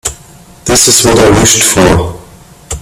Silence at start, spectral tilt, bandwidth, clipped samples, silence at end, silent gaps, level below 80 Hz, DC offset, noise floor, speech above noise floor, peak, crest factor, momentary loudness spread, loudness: 0.05 s; -3 dB/octave; over 20 kHz; 0.6%; 0 s; none; -26 dBFS; under 0.1%; -36 dBFS; 29 dB; 0 dBFS; 10 dB; 16 LU; -6 LUFS